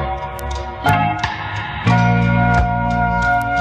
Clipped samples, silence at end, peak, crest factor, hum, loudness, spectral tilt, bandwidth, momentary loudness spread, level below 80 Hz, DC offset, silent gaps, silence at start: under 0.1%; 0 s; -2 dBFS; 16 dB; none; -17 LUFS; -7 dB/octave; 15.5 kHz; 10 LU; -28 dBFS; under 0.1%; none; 0 s